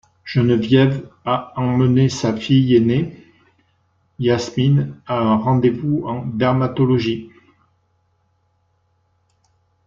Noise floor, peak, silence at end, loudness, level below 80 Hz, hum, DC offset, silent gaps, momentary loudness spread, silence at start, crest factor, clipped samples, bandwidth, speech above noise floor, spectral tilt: -64 dBFS; -2 dBFS; 2.6 s; -18 LUFS; -54 dBFS; none; under 0.1%; none; 8 LU; 0.25 s; 16 dB; under 0.1%; 7.6 kHz; 47 dB; -7.5 dB/octave